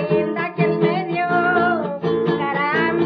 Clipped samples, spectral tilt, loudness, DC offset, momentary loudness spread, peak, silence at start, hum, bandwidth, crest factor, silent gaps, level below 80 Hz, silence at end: under 0.1%; -9 dB/octave; -19 LUFS; under 0.1%; 4 LU; -4 dBFS; 0 s; none; 5.8 kHz; 16 dB; none; -60 dBFS; 0 s